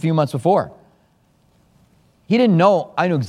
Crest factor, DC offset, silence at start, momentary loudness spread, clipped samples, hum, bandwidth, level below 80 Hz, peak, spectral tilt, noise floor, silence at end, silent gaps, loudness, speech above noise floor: 18 dB; under 0.1%; 0.05 s; 7 LU; under 0.1%; none; 12 kHz; -62 dBFS; -2 dBFS; -8 dB/octave; -58 dBFS; 0 s; none; -17 LUFS; 42 dB